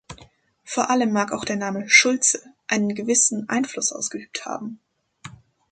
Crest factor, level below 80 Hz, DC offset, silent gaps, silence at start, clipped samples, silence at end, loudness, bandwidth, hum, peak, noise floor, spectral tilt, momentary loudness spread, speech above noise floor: 22 dB; -62 dBFS; under 0.1%; none; 0.1 s; under 0.1%; 0.35 s; -21 LUFS; 9.6 kHz; none; -2 dBFS; -52 dBFS; -2 dB/octave; 16 LU; 30 dB